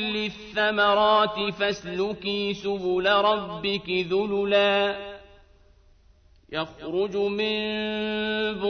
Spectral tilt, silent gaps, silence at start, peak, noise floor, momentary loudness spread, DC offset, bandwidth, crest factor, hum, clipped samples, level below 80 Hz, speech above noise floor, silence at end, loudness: -5 dB/octave; none; 0 s; -8 dBFS; -57 dBFS; 9 LU; under 0.1%; 6.6 kHz; 18 dB; none; under 0.1%; -56 dBFS; 32 dB; 0 s; -25 LUFS